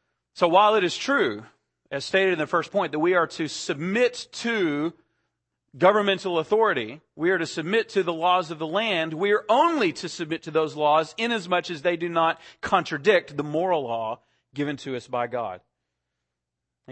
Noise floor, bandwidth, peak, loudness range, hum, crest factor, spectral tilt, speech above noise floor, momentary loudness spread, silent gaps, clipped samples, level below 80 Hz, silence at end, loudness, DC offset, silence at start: -84 dBFS; 8.8 kHz; -4 dBFS; 3 LU; none; 20 dB; -4.5 dB/octave; 60 dB; 11 LU; none; under 0.1%; -68 dBFS; 0 s; -24 LUFS; under 0.1%; 0.35 s